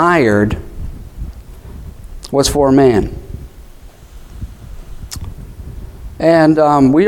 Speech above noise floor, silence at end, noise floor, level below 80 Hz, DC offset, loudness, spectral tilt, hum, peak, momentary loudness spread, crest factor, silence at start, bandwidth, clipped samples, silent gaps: 27 dB; 0 s; -37 dBFS; -30 dBFS; 0.1%; -12 LUFS; -6 dB/octave; none; 0 dBFS; 24 LU; 14 dB; 0 s; 17 kHz; under 0.1%; none